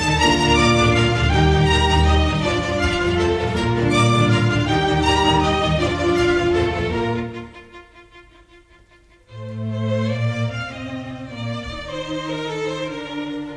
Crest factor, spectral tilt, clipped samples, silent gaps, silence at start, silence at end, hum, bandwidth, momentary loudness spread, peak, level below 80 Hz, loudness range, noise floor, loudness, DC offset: 16 dB; -5.5 dB/octave; under 0.1%; none; 0 s; 0 s; none; 11 kHz; 13 LU; -4 dBFS; -30 dBFS; 10 LU; -51 dBFS; -19 LUFS; under 0.1%